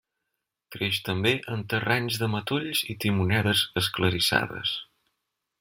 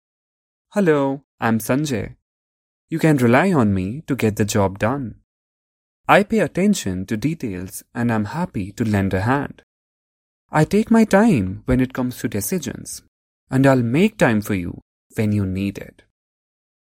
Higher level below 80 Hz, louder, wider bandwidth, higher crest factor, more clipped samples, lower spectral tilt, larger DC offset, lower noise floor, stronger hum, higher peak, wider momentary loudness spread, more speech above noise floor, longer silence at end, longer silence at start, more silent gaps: second, -58 dBFS vs -46 dBFS; second, -26 LUFS vs -19 LUFS; about the same, 16.5 kHz vs 16.5 kHz; about the same, 22 dB vs 20 dB; neither; second, -4.5 dB/octave vs -6.5 dB/octave; neither; second, -83 dBFS vs under -90 dBFS; neither; second, -6 dBFS vs 0 dBFS; second, 7 LU vs 14 LU; second, 57 dB vs over 71 dB; second, 0.8 s vs 1.1 s; about the same, 0.7 s vs 0.75 s; second, none vs 1.24-1.38 s, 2.22-2.88 s, 5.24-6.04 s, 9.63-10.49 s, 13.08-13.47 s, 14.82-15.10 s